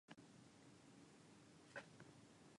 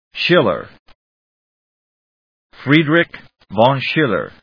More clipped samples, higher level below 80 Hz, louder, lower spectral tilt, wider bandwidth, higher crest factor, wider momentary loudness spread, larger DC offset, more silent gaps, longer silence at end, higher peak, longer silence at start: neither; second, -88 dBFS vs -56 dBFS; second, -63 LUFS vs -15 LUFS; second, -4.5 dB/octave vs -7.5 dB/octave; first, 11 kHz vs 5.4 kHz; about the same, 22 dB vs 18 dB; second, 8 LU vs 12 LU; neither; second, none vs 0.79-0.86 s, 0.95-2.50 s; second, 0 s vs 0.15 s; second, -42 dBFS vs 0 dBFS; about the same, 0.1 s vs 0.15 s